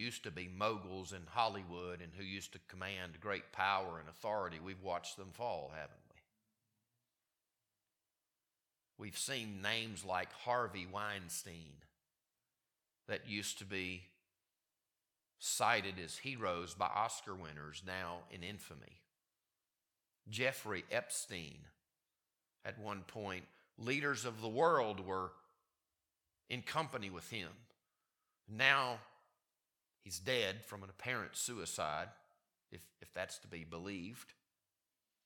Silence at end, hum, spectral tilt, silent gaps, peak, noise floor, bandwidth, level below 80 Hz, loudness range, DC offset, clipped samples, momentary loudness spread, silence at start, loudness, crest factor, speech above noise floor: 0.95 s; none; -3 dB/octave; none; -14 dBFS; under -90 dBFS; 19 kHz; -74 dBFS; 8 LU; under 0.1%; under 0.1%; 15 LU; 0 s; -41 LUFS; 30 dB; over 48 dB